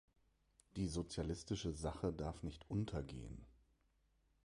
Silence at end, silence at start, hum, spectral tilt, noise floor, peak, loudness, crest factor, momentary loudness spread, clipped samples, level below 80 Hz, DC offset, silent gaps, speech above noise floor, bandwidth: 0.95 s; 0.75 s; none; -6 dB/octave; -79 dBFS; -30 dBFS; -45 LUFS; 16 dB; 10 LU; under 0.1%; -56 dBFS; under 0.1%; none; 35 dB; 11.5 kHz